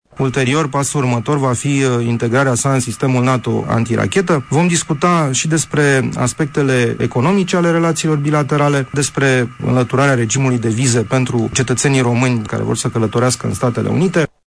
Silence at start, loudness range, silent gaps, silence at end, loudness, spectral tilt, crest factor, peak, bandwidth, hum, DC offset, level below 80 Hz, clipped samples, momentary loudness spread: 0.15 s; 1 LU; none; 0.2 s; -15 LUFS; -5 dB/octave; 14 dB; 0 dBFS; 11 kHz; none; under 0.1%; -46 dBFS; under 0.1%; 3 LU